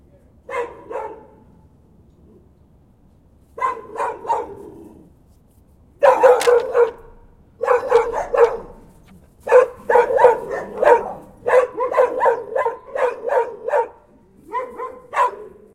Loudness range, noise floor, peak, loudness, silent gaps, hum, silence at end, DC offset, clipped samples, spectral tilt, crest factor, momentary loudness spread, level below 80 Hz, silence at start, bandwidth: 14 LU; -52 dBFS; 0 dBFS; -18 LUFS; none; none; 0.25 s; under 0.1%; under 0.1%; -3.5 dB/octave; 20 dB; 16 LU; -52 dBFS; 0.5 s; 14 kHz